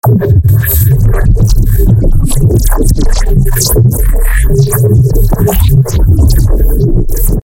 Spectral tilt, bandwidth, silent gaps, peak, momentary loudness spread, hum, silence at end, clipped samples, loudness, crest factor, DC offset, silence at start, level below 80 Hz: -6 dB/octave; 17 kHz; none; 0 dBFS; 4 LU; none; 0.05 s; 0.1%; -9 LUFS; 6 dB; under 0.1%; 0.05 s; -10 dBFS